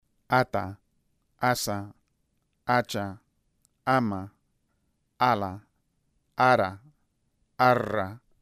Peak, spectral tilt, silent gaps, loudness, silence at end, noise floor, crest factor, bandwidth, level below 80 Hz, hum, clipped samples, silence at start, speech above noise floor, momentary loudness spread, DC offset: -6 dBFS; -5 dB/octave; none; -26 LUFS; 0.25 s; -74 dBFS; 22 dB; 15.5 kHz; -64 dBFS; none; under 0.1%; 0.3 s; 48 dB; 16 LU; under 0.1%